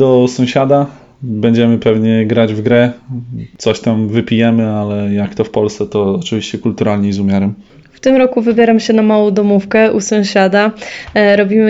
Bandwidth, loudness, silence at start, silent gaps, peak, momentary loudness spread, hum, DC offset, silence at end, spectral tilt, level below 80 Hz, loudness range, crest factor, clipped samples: 8 kHz; -12 LUFS; 0 s; none; 0 dBFS; 8 LU; none; under 0.1%; 0 s; -6.5 dB/octave; -48 dBFS; 4 LU; 12 dB; under 0.1%